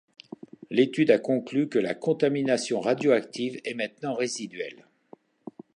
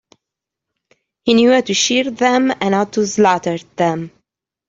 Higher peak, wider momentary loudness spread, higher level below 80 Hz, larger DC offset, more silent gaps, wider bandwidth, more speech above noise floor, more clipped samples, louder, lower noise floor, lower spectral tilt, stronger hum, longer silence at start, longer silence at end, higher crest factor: second, -6 dBFS vs -2 dBFS; first, 23 LU vs 11 LU; second, -78 dBFS vs -58 dBFS; neither; neither; first, 11 kHz vs 8 kHz; second, 29 dB vs 68 dB; neither; second, -26 LUFS vs -15 LUFS; second, -55 dBFS vs -83 dBFS; about the same, -5 dB/octave vs -4 dB/octave; neither; second, 0.7 s vs 1.25 s; first, 1.05 s vs 0.6 s; first, 20 dB vs 14 dB